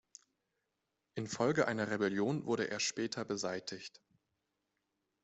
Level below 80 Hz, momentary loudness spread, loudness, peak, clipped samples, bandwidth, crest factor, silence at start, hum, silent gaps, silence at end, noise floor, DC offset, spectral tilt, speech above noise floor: -76 dBFS; 13 LU; -36 LUFS; -18 dBFS; under 0.1%; 8.2 kHz; 20 dB; 1.15 s; none; none; 1.35 s; -86 dBFS; under 0.1%; -4 dB/octave; 50 dB